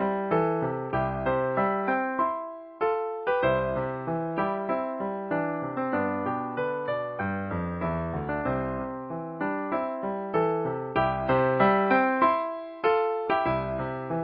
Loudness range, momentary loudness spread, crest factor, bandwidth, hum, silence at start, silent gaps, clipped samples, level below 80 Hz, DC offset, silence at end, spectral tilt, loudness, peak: 6 LU; 8 LU; 18 dB; 5.2 kHz; none; 0 s; none; under 0.1%; -50 dBFS; under 0.1%; 0 s; -11 dB/octave; -28 LUFS; -8 dBFS